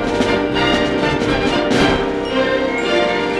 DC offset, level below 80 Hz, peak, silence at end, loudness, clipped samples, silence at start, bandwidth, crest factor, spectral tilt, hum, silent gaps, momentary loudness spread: under 0.1%; -34 dBFS; -2 dBFS; 0 s; -16 LUFS; under 0.1%; 0 s; 12.5 kHz; 14 dB; -5 dB/octave; none; none; 3 LU